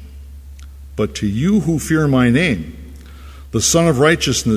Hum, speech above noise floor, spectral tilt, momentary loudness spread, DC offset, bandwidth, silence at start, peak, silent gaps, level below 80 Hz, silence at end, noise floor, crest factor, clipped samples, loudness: none; 21 dB; -4.5 dB/octave; 11 LU; under 0.1%; 16 kHz; 0 s; 0 dBFS; none; -34 dBFS; 0 s; -36 dBFS; 16 dB; under 0.1%; -16 LUFS